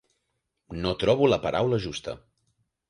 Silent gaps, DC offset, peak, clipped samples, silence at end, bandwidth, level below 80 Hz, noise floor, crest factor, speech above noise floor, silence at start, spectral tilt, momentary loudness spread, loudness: none; under 0.1%; -8 dBFS; under 0.1%; 0.75 s; 11 kHz; -50 dBFS; -79 dBFS; 20 dB; 54 dB; 0.7 s; -6 dB/octave; 18 LU; -25 LUFS